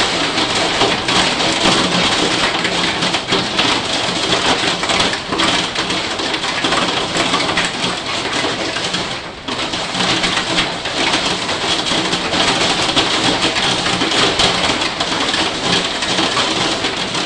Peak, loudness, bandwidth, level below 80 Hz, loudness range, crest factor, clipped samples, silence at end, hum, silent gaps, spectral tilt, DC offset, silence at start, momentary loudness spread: 0 dBFS; -15 LUFS; 11.5 kHz; -42 dBFS; 3 LU; 16 dB; under 0.1%; 0 s; none; none; -2.5 dB/octave; under 0.1%; 0 s; 5 LU